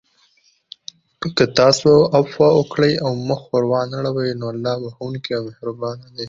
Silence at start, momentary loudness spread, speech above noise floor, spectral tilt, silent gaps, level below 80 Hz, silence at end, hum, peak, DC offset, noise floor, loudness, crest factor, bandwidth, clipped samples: 1.2 s; 15 LU; 41 dB; -5.5 dB/octave; none; -54 dBFS; 0 s; none; -2 dBFS; under 0.1%; -59 dBFS; -18 LUFS; 18 dB; 7.6 kHz; under 0.1%